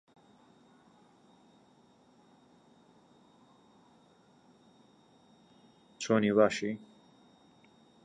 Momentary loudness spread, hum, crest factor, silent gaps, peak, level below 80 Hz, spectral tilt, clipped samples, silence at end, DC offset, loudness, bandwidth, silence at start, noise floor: 17 LU; none; 26 dB; none; -12 dBFS; -76 dBFS; -5.5 dB/octave; under 0.1%; 1.3 s; under 0.1%; -30 LUFS; 9.8 kHz; 6 s; -64 dBFS